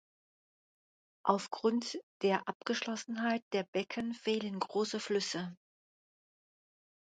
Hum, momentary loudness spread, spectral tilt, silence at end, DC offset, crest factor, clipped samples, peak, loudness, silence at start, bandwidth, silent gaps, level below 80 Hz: none; 5 LU; -4 dB/octave; 1.45 s; under 0.1%; 26 dB; under 0.1%; -12 dBFS; -35 LUFS; 1.25 s; 9.4 kHz; 2.03-2.20 s, 2.55-2.60 s, 3.42-3.51 s, 3.68-3.73 s; -82 dBFS